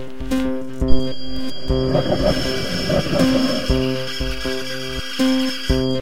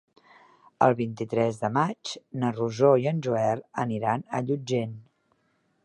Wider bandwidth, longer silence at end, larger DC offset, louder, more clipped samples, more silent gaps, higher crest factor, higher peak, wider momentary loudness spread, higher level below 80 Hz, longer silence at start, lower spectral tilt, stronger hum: first, 16.5 kHz vs 11 kHz; second, 0 s vs 0.85 s; neither; first, -21 LUFS vs -26 LUFS; neither; neither; about the same, 18 dB vs 22 dB; first, 0 dBFS vs -6 dBFS; about the same, 8 LU vs 9 LU; first, -28 dBFS vs -68 dBFS; second, 0 s vs 0.8 s; second, -5.5 dB/octave vs -7 dB/octave; neither